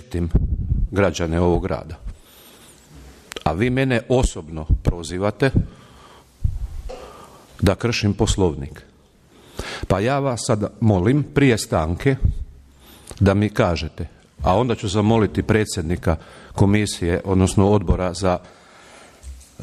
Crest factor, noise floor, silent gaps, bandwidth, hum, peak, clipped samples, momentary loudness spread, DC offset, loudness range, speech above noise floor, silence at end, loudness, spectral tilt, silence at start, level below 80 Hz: 16 dB; -52 dBFS; none; 14 kHz; none; -4 dBFS; under 0.1%; 18 LU; under 0.1%; 4 LU; 33 dB; 0 s; -20 LUFS; -6 dB/octave; 0 s; -30 dBFS